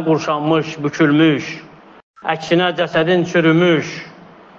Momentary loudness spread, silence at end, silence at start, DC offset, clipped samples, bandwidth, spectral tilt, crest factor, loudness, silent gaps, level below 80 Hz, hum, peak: 15 LU; 0.35 s; 0 s; under 0.1%; under 0.1%; 7.2 kHz; -6 dB/octave; 14 dB; -16 LUFS; 2.03-2.14 s; -60 dBFS; none; -2 dBFS